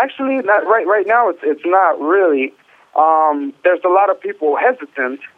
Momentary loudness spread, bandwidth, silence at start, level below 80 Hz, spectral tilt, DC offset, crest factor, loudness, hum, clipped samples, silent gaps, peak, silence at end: 7 LU; 4.1 kHz; 0 s; -74 dBFS; -6.5 dB/octave; under 0.1%; 14 dB; -15 LUFS; none; under 0.1%; none; 0 dBFS; 0.1 s